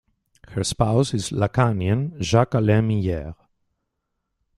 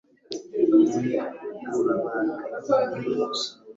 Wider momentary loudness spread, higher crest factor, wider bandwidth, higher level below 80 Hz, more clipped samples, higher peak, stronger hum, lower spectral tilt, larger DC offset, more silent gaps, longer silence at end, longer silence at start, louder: second, 8 LU vs 14 LU; about the same, 20 dB vs 16 dB; first, 12 kHz vs 8 kHz; first, -46 dBFS vs -68 dBFS; neither; first, -2 dBFS vs -8 dBFS; neither; about the same, -6 dB/octave vs -5.5 dB/octave; neither; neither; first, 1.25 s vs 0.05 s; first, 0.5 s vs 0.3 s; first, -22 LUFS vs -25 LUFS